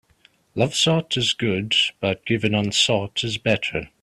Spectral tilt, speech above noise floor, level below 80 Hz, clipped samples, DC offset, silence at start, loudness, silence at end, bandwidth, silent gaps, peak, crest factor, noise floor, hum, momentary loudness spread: -4 dB/octave; 37 dB; -54 dBFS; under 0.1%; under 0.1%; 0.55 s; -21 LUFS; 0.15 s; 13 kHz; none; -4 dBFS; 18 dB; -59 dBFS; none; 6 LU